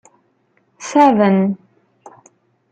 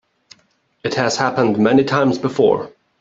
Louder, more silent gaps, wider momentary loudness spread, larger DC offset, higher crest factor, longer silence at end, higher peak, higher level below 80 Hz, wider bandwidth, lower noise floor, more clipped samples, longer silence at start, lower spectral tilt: first, -14 LUFS vs -17 LUFS; neither; first, 19 LU vs 9 LU; neither; about the same, 16 dB vs 16 dB; first, 1.15 s vs 0.3 s; about the same, -2 dBFS vs -2 dBFS; second, -66 dBFS vs -58 dBFS; first, 8.8 kHz vs 7.8 kHz; about the same, -61 dBFS vs -61 dBFS; neither; about the same, 0.8 s vs 0.85 s; about the same, -6.5 dB/octave vs -5.5 dB/octave